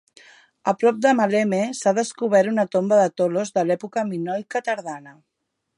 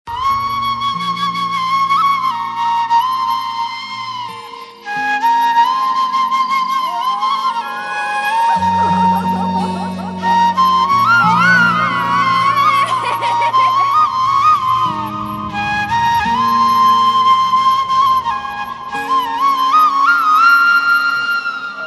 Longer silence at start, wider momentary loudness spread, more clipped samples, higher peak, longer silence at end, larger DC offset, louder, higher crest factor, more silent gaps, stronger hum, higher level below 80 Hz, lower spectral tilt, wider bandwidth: first, 0.65 s vs 0.05 s; about the same, 9 LU vs 11 LU; neither; second, -6 dBFS vs 0 dBFS; first, 0.65 s vs 0 s; neither; second, -21 LUFS vs -14 LUFS; about the same, 16 dB vs 14 dB; neither; neither; second, -74 dBFS vs -52 dBFS; first, -5.5 dB/octave vs -4 dB/octave; about the same, 11.5 kHz vs 12 kHz